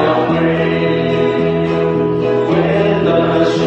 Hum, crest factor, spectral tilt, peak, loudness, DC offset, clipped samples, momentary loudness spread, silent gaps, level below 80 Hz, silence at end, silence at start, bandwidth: none; 12 dB; -7.5 dB/octave; 0 dBFS; -14 LUFS; under 0.1%; under 0.1%; 2 LU; none; -42 dBFS; 0 s; 0 s; 8.2 kHz